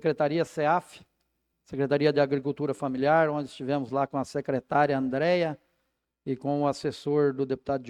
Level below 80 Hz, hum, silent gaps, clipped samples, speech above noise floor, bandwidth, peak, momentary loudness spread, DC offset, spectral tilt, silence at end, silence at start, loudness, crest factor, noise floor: -66 dBFS; none; none; under 0.1%; 52 dB; 12 kHz; -8 dBFS; 8 LU; under 0.1%; -7 dB/octave; 0 s; 0.05 s; -27 LUFS; 18 dB; -78 dBFS